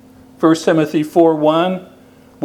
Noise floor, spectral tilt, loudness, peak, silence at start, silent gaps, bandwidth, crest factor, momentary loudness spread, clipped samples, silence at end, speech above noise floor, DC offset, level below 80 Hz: -43 dBFS; -6.5 dB/octave; -14 LUFS; 0 dBFS; 0.4 s; none; 14.5 kHz; 16 dB; 6 LU; under 0.1%; 0 s; 30 dB; under 0.1%; -60 dBFS